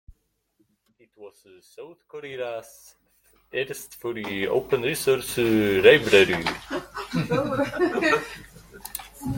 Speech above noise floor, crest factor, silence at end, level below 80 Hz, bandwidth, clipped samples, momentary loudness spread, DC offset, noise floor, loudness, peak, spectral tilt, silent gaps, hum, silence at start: 46 dB; 24 dB; 0 s; -54 dBFS; 17 kHz; under 0.1%; 22 LU; under 0.1%; -69 dBFS; -23 LUFS; -2 dBFS; -4.5 dB/octave; none; none; 1.2 s